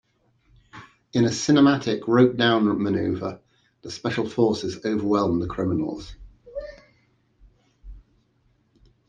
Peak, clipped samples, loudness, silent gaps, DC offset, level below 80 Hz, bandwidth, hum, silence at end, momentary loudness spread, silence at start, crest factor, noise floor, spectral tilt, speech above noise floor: -6 dBFS; under 0.1%; -22 LUFS; none; under 0.1%; -52 dBFS; 9.2 kHz; none; 1.1 s; 20 LU; 0.75 s; 18 dB; -65 dBFS; -6 dB/octave; 43 dB